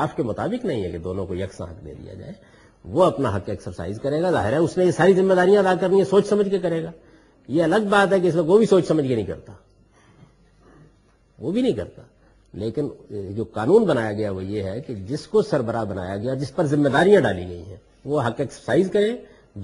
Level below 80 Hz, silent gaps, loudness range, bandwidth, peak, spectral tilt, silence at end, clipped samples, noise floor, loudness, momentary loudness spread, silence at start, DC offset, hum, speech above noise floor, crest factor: -52 dBFS; none; 10 LU; 11.5 kHz; -2 dBFS; -7 dB/octave; 0 s; under 0.1%; -58 dBFS; -21 LUFS; 17 LU; 0 s; under 0.1%; none; 37 dB; 18 dB